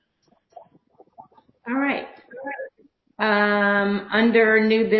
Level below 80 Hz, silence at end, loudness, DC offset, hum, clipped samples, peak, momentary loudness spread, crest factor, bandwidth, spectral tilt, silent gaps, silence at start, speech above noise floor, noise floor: -66 dBFS; 0 s; -20 LUFS; under 0.1%; none; under 0.1%; -6 dBFS; 20 LU; 18 dB; 5.6 kHz; -8.5 dB/octave; none; 1.2 s; 46 dB; -65 dBFS